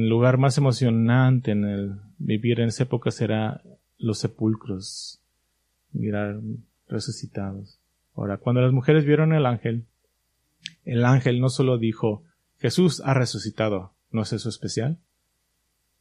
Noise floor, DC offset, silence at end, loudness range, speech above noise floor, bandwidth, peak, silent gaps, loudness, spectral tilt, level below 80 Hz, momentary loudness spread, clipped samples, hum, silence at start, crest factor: -72 dBFS; under 0.1%; 1.05 s; 8 LU; 50 dB; 11 kHz; -4 dBFS; none; -24 LUFS; -7 dB/octave; -62 dBFS; 15 LU; under 0.1%; none; 0 s; 20 dB